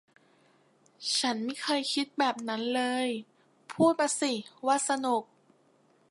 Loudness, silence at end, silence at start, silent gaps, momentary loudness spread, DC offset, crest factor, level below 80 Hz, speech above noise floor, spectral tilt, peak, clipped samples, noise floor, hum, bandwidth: -29 LUFS; 0.85 s; 1 s; none; 7 LU; under 0.1%; 20 dB; -84 dBFS; 36 dB; -2.5 dB/octave; -12 dBFS; under 0.1%; -66 dBFS; none; 11.5 kHz